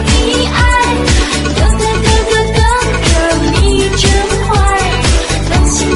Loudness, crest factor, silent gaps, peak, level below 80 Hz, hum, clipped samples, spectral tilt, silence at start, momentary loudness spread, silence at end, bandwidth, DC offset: -11 LUFS; 10 dB; none; 0 dBFS; -14 dBFS; none; under 0.1%; -4 dB/octave; 0 s; 2 LU; 0 s; 11.5 kHz; under 0.1%